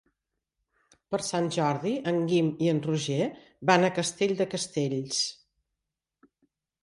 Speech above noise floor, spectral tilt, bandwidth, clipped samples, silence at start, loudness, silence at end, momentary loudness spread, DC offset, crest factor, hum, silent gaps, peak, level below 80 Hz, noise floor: 59 dB; -4.5 dB/octave; 11.5 kHz; under 0.1%; 1.1 s; -28 LUFS; 1.5 s; 8 LU; under 0.1%; 20 dB; none; none; -8 dBFS; -70 dBFS; -86 dBFS